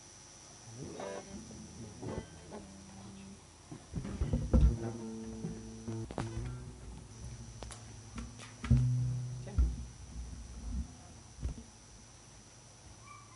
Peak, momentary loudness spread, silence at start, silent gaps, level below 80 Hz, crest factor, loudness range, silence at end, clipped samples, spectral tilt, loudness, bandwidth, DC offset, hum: -14 dBFS; 21 LU; 0 s; none; -42 dBFS; 24 dB; 10 LU; 0 s; under 0.1%; -6.5 dB/octave; -39 LUFS; 11.5 kHz; under 0.1%; none